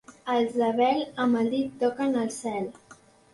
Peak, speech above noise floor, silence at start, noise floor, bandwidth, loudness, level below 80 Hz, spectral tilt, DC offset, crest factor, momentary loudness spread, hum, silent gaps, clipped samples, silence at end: -12 dBFS; 29 dB; 0.1 s; -54 dBFS; 11.5 kHz; -26 LUFS; -68 dBFS; -5 dB/octave; under 0.1%; 16 dB; 8 LU; none; none; under 0.1%; 0.4 s